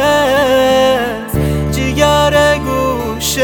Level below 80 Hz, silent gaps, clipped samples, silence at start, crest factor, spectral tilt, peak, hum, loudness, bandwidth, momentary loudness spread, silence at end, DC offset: -26 dBFS; none; under 0.1%; 0 s; 12 dB; -4.5 dB/octave; 0 dBFS; none; -12 LUFS; over 20 kHz; 7 LU; 0 s; under 0.1%